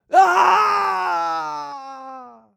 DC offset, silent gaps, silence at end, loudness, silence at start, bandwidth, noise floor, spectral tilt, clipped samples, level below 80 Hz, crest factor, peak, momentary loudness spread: under 0.1%; none; 0.25 s; -17 LUFS; 0.1 s; 16 kHz; -39 dBFS; -2 dB/octave; under 0.1%; -74 dBFS; 16 dB; -4 dBFS; 21 LU